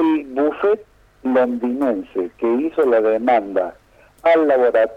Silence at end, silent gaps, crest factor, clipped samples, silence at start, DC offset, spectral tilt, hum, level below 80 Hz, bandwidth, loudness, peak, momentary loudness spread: 0 s; none; 14 dB; under 0.1%; 0 s; under 0.1%; -6.5 dB/octave; none; -56 dBFS; 9.6 kHz; -18 LUFS; -4 dBFS; 8 LU